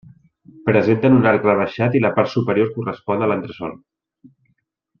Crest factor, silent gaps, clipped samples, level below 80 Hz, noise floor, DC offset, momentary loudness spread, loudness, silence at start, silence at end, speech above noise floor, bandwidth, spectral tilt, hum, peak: 16 dB; none; under 0.1%; -56 dBFS; -68 dBFS; under 0.1%; 12 LU; -18 LUFS; 0.65 s; 1.25 s; 51 dB; 6.8 kHz; -9 dB/octave; none; -2 dBFS